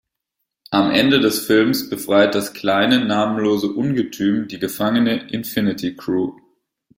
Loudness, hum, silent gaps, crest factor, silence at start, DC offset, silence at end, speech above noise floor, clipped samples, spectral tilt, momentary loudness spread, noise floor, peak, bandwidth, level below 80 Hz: -18 LUFS; none; none; 18 dB; 0.7 s; under 0.1%; 0.65 s; 60 dB; under 0.1%; -5 dB/octave; 7 LU; -78 dBFS; -2 dBFS; 16.5 kHz; -58 dBFS